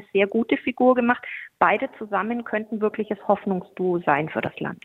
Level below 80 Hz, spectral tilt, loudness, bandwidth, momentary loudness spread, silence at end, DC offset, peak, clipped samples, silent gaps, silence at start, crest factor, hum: -64 dBFS; -8.5 dB/octave; -23 LUFS; 4.2 kHz; 8 LU; 0.1 s; under 0.1%; -2 dBFS; under 0.1%; none; 0 s; 20 dB; none